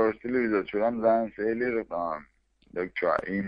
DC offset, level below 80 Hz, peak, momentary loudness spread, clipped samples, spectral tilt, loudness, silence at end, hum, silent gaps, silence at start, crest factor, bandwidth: under 0.1%; -60 dBFS; -10 dBFS; 9 LU; under 0.1%; -9 dB/octave; -28 LUFS; 0 s; none; none; 0 s; 18 dB; 5.4 kHz